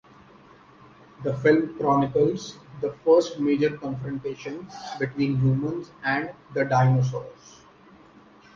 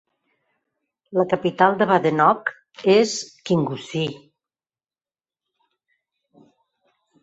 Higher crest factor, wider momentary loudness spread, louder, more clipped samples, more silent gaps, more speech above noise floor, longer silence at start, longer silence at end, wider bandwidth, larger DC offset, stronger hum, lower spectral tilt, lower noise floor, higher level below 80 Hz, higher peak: about the same, 18 dB vs 22 dB; first, 15 LU vs 10 LU; second, -24 LUFS vs -20 LUFS; neither; neither; second, 28 dB vs over 70 dB; about the same, 1.2 s vs 1.1 s; second, 1.25 s vs 3.05 s; second, 7.2 kHz vs 8.2 kHz; neither; neither; first, -7.5 dB/octave vs -5 dB/octave; second, -52 dBFS vs under -90 dBFS; first, -58 dBFS vs -66 dBFS; second, -6 dBFS vs -2 dBFS